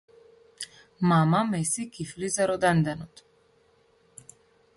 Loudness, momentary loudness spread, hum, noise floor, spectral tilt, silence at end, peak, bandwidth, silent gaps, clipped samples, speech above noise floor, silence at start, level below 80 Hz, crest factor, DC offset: -25 LUFS; 18 LU; none; -63 dBFS; -5.5 dB/octave; 1.7 s; -12 dBFS; 12 kHz; none; under 0.1%; 38 dB; 0.6 s; -62 dBFS; 18 dB; under 0.1%